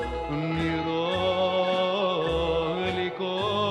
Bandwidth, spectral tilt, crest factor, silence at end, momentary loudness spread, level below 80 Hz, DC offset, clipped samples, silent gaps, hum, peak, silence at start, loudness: 10.5 kHz; -6 dB/octave; 12 dB; 0 s; 4 LU; -44 dBFS; under 0.1%; under 0.1%; none; none; -14 dBFS; 0 s; -26 LUFS